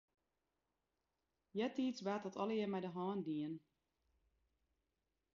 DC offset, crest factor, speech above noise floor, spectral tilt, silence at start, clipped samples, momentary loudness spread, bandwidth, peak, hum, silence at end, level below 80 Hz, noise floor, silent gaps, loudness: under 0.1%; 18 dB; 47 dB; -5.5 dB/octave; 1.55 s; under 0.1%; 7 LU; 7.2 kHz; -28 dBFS; none; 1.75 s; -84 dBFS; -89 dBFS; none; -43 LUFS